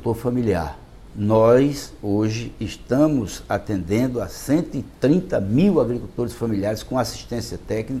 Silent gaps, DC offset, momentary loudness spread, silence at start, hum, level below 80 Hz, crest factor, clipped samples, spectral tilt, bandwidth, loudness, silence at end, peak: none; under 0.1%; 12 LU; 0 s; none; -42 dBFS; 16 dB; under 0.1%; -7 dB/octave; 15 kHz; -22 LUFS; 0 s; -4 dBFS